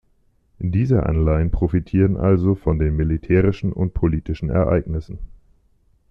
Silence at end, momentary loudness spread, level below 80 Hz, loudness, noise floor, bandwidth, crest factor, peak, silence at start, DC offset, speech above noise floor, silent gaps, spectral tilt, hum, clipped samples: 0.85 s; 8 LU; -30 dBFS; -20 LUFS; -60 dBFS; 5.8 kHz; 16 dB; -4 dBFS; 0.6 s; under 0.1%; 42 dB; none; -11 dB/octave; none; under 0.1%